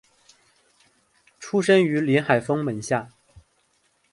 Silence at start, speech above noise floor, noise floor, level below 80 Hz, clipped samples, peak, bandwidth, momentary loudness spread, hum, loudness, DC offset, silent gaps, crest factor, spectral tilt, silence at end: 1.4 s; 46 dB; -67 dBFS; -64 dBFS; under 0.1%; -6 dBFS; 11.5 kHz; 9 LU; none; -22 LUFS; under 0.1%; none; 20 dB; -6 dB/octave; 1.05 s